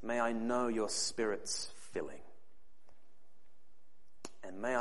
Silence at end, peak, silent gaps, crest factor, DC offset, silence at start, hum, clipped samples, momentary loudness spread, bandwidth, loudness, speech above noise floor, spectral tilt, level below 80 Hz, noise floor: 0 s; -20 dBFS; none; 20 dB; 0.7%; 0.05 s; none; under 0.1%; 17 LU; 11.5 kHz; -37 LUFS; 39 dB; -2.5 dB/octave; -72 dBFS; -75 dBFS